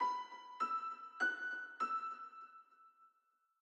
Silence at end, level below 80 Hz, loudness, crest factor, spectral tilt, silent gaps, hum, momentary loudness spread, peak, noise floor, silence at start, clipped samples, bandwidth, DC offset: 0.55 s; under -90 dBFS; -41 LUFS; 18 dB; -0.5 dB/octave; none; none; 16 LU; -26 dBFS; -80 dBFS; 0 s; under 0.1%; 8.8 kHz; under 0.1%